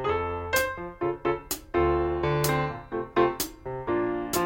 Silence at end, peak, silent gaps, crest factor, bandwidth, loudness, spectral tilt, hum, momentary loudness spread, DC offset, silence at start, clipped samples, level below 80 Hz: 0 s; -10 dBFS; none; 18 dB; 17 kHz; -28 LUFS; -5 dB/octave; none; 7 LU; under 0.1%; 0 s; under 0.1%; -44 dBFS